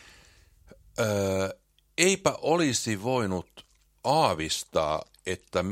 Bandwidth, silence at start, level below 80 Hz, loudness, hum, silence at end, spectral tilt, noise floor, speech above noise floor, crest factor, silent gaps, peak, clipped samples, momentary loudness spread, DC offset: 16.5 kHz; 1 s; -56 dBFS; -27 LUFS; none; 0 s; -4 dB/octave; -57 dBFS; 31 dB; 26 dB; none; -4 dBFS; under 0.1%; 11 LU; under 0.1%